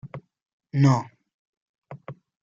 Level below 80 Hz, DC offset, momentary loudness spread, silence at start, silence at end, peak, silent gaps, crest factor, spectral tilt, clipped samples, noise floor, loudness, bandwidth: -64 dBFS; under 0.1%; 23 LU; 0.05 s; 0.3 s; -8 dBFS; 0.42-0.46 s, 0.53-0.60 s, 1.34-1.82 s; 20 dB; -7.5 dB/octave; under 0.1%; -43 dBFS; -22 LUFS; 7.6 kHz